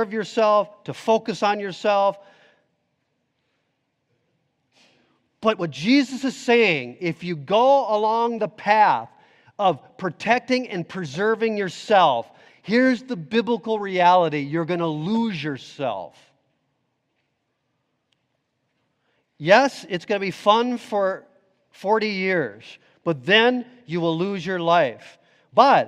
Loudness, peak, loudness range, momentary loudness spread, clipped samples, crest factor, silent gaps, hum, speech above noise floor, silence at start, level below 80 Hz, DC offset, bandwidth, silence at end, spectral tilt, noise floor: -21 LUFS; 0 dBFS; 8 LU; 12 LU; under 0.1%; 22 dB; none; none; 53 dB; 0 s; -72 dBFS; under 0.1%; 12 kHz; 0 s; -5.5 dB/octave; -74 dBFS